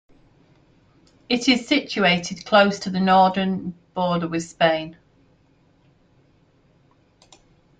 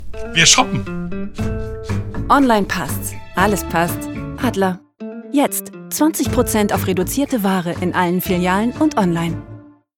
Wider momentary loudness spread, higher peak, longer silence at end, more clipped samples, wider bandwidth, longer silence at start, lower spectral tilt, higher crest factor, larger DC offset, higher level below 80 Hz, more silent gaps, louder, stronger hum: about the same, 11 LU vs 13 LU; about the same, -2 dBFS vs 0 dBFS; first, 2.85 s vs 0.3 s; neither; second, 9.2 kHz vs 18 kHz; first, 1.3 s vs 0 s; about the same, -5 dB/octave vs -4 dB/octave; about the same, 22 dB vs 18 dB; neither; second, -60 dBFS vs -36 dBFS; neither; about the same, -20 LUFS vs -18 LUFS; neither